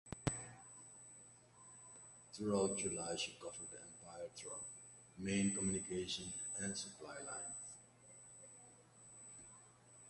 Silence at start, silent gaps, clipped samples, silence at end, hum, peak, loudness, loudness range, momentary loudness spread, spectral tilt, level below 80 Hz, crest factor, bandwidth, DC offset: 0.05 s; none; under 0.1%; 0 s; none; -22 dBFS; -43 LUFS; 5 LU; 21 LU; -3.5 dB/octave; -68 dBFS; 24 dB; 11.5 kHz; under 0.1%